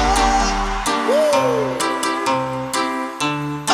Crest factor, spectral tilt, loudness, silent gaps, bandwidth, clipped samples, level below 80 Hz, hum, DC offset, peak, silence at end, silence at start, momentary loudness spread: 16 dB; -3.5 dB/octave; -19 LUFS; none; 16.5 kHz; under 0.1%; -30 dBFS; none; under 0.1%; -4 dBFS; 0 s; 0 s; 6 LU